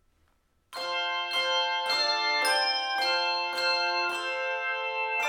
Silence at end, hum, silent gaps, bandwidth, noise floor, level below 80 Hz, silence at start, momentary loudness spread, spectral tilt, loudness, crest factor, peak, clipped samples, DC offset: 0 s; none; none; 18 kHz; -69 dBFS; -74 dBFS; 0.7 s; 6 LU; 1 dB/octave; -27 LUFS; 16 dB; -14 dBFS; under 0.1%; under 0.1%